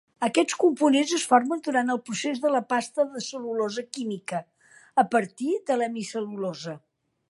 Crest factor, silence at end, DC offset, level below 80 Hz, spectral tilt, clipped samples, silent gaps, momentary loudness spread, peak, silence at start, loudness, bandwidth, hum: 20 dB; 0.5 s; under 0.1%; -80 dBFS; -3.5 dB/octave; under 0.1%; none; 11 LU; -6 dBFS; 0.2 s; -26 LUFS; 11.5 kHz; none